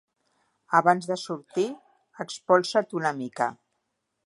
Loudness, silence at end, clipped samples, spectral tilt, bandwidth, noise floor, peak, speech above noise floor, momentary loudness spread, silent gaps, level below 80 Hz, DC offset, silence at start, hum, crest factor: -26 LUFS; 0.75 s; under 0.1%; -4.5 dB/octave; 11.5 kHz; -78 dBFS; -4 dBFS; 53 dB; 15 LU; none; -78 dBFS; under 0.1%; 0.7 s; none; 22 dB